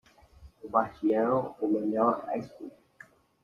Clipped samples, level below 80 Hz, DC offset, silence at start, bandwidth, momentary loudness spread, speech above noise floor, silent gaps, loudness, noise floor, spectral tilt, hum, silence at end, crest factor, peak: under 0.1%; -64 dBFS; under 0.1%; 0.4 s; 6.8 kHz; 20 LU; 28 dB; none; -29 LUFS; -56 dBFS; -9 dB/octave; none; 0.75 s; 22 dB; -10 dBFS